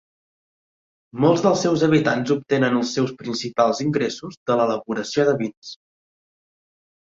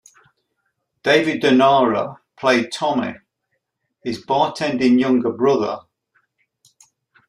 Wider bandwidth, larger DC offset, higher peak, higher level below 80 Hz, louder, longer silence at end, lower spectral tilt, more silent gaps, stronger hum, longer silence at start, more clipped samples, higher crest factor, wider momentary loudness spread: second, 7.8 kHz vs 11.5 kHz; neither; about the same, -4 dBFS vs -2 dBFS; about the same, -62 dBFS vs -62 dBFS; second, -21 LUFS vs -18 LUFS; second, 1.35 s vs 1.5 s; about the same, -5.5 dB/octave vs -5 dB/octave; first, 4.37-4.46 s, 5.57-5.62 s vs none; neither; about the same, 1.15 s vs 1.05 s; neither; about the same, 18 dB vs 18 dB; second, 10 LU vs 14 LU